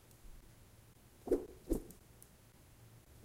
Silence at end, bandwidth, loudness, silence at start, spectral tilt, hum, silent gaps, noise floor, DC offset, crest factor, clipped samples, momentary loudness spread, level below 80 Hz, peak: 0 s; 16 kHz; -41 LUFS; 0.1 s; -6.5 dB/octave; none; none; -63 dBFS; under 0.1%; 24 dB; under 0.1%; 24 LU; -54 dBFS; -22 dBFS